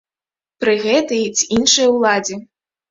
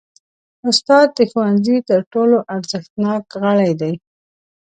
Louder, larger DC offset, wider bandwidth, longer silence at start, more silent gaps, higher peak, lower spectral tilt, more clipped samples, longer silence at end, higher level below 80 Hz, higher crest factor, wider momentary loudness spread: about the same, -15 LUFS vs -16 LUFS; neither; second, 7.8 kHz vs 9.2 kHz; about the same, 0.6 s vs 0.65 s; second, none vs 2.07-2.11 s, 2.90-2.96 s; about the same, 0 dBFS vs 0 dBFS; second, -2 dB/octave vs -5.5 dB/octave; neither; second, 0.5 s vs 0.7 s; first, -54 dBFS vs -64 dBFS; about the same, 16 dB vs 16 dB; about the same, 9 LU vs 11 LU